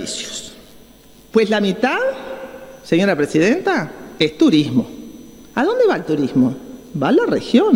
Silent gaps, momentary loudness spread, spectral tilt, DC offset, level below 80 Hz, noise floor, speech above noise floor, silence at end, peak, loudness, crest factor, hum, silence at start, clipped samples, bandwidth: none; 16 LU; -5.5 dB/octave; under 0.1%; -54 dBFS; -45 dBFS; 29 dB; 0 s; 0 dBFS; -17 LUFS; 18 dB; none; 0 s; under 0.1%; 15.5 kHz